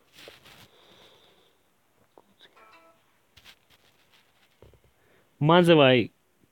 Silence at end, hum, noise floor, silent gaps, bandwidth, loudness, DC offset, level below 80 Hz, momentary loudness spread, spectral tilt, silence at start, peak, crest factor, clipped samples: 0.45 s; none; -68 dBFS; none; 16.5 kHz; -20 LUFS; under 0.1%; -68 dBFS; 11 LU; -7 dB/octave; 5.4 s; -4 dBFS; 24 dB; under 0.1%